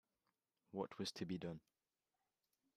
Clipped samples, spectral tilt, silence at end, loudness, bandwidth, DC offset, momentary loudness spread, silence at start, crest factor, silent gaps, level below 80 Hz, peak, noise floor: under 0.1%; -5.5 dB/octave; 1.15 s; -48 LUFS; 14 kHz; under 0.1%; 7 LU; 0.75 s; 22 dB; none; -82 dBFS; -30 dBFS; under -90 dBFS